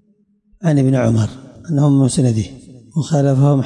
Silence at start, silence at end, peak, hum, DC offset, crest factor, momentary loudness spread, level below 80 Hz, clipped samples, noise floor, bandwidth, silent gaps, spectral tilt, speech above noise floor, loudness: 0.6 s; 0 s; -6 dBFS; none; under 0.1%; 10 dB; 11 LU; -48 dBFS; under 0.1%; -58 dBFS; 11 kHz; none; -7.5 dB/octave; 44 dB; -16 LUFS